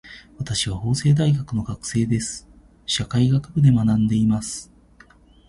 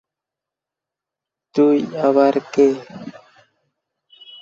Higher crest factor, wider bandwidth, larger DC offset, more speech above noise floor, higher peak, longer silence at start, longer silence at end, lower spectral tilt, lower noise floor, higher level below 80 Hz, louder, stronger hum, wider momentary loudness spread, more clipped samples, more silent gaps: about the same, 16 dB vs 18 dB; first, 11.5 kHz vs 7.4 kHz; neither; second, 31 dB vs 70 dB; second, -6 dBFS vs -2 dBFS; second, 0.05 s vs 1.55 s; second, 0.85 s vs 1.3 s; about the same, -5.5 dB/octave vs -6.5 dB/octave; second, -51 dBFS vs -86 dBFS; first, -44 dBFS vs -66 dBFS; second, -21 LUFS vs -17 LUFS; neither; second, 13 LU vs 21 LU; neither; neither